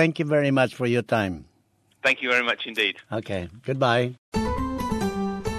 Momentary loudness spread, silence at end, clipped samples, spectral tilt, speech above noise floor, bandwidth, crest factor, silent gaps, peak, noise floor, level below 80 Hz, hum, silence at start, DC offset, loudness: 9 LU; 0 s; under 0.1%; -5.5 dB/octave; 41 dB; 14.5 kHz; 20 dB; 4.18-4.32 s; -6 dBFS; -65 dBFS; -44 dBFS; none; 0 s; under 0.1%; -24 LUFS